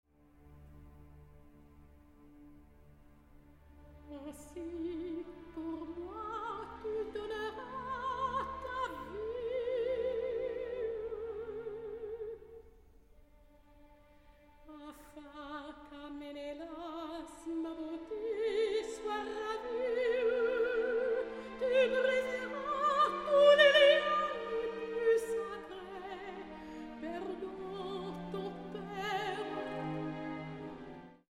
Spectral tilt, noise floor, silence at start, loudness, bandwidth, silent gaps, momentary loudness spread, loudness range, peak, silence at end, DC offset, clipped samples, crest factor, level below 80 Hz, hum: -4.5 dB/octave; -62 dBFS; 0.4 s; -35 LUFS; 13.5 kHz; none; 17 LU; 20 LU; -14 dBFS; 0.15 s; under 0.1%; under 0.1%; 24 dB; -62 dBFS; none